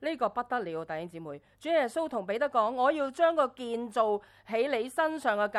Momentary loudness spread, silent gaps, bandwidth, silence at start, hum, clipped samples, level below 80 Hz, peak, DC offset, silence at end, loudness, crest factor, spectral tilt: 11 LU; none; 13 kHz; 0 s; none; under 0.1%; -72 dBFS; -12 dBFS; under 0.1%; 0 s; -30 LUFS; 18 dB; -4.5 dB/octave